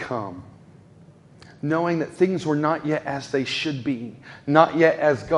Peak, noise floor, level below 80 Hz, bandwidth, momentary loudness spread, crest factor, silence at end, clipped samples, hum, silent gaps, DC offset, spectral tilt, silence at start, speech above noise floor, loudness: 0 dBFS; -50 dBFS; -60 dBFS; 11 kHz; 14 LU; 22 dB; 0 s; under 0.1%; none; none; under 0.1%; -6 dB/octave; 0 s; 28 dB; -22 LUFS